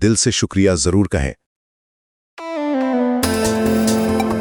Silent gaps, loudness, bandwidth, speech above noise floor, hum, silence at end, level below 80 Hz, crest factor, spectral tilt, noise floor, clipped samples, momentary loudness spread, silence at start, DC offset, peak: 1.46-2.37 s; -17 LUFS; 19.5 kHz; over 74 dB; none; 0 s; -36 dBFS; 16 dB; -4.5 dB/octave; under -90 dBFS; under 0.1%; 9 LU; 0 s; under 0.1%; -2 dBFS